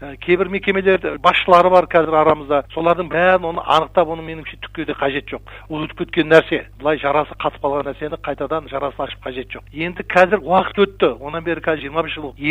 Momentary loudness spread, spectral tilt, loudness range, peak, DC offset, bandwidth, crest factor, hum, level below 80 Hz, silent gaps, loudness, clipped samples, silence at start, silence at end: 14 LU; -6.5 dB/octave; 6 LU; 0 dBFS; under 0.1%; 9.6 kHz; 18 dB; none; -42 dBFS; none; -18 LUFS; under 0.1%; 0 s; 0 s